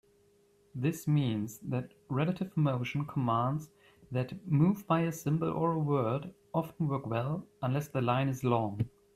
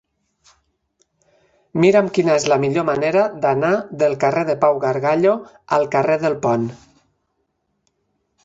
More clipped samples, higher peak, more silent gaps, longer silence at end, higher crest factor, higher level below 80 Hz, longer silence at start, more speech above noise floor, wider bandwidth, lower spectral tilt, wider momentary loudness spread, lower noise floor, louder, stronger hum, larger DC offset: neither; second, -14 dBFS vs -2 dBFS; neither; second, 0.25 s vs 1.7 s; about the same, 18 dB vs 18 dB; second, -66 dBFS vs -60 dBFS; second, 0.75 s vs 1.75 s; second, 35 dB vs 54 dB; first, 14.5 kHz vs 8 kHz; first, -7.5 dB/octave vs -6 dB/octave; about the same, 7 LU vs 5 LU; second, -66 dBFS vs -71 dBFS; second, -32 LUFS vs -18 LUFS; neither; neither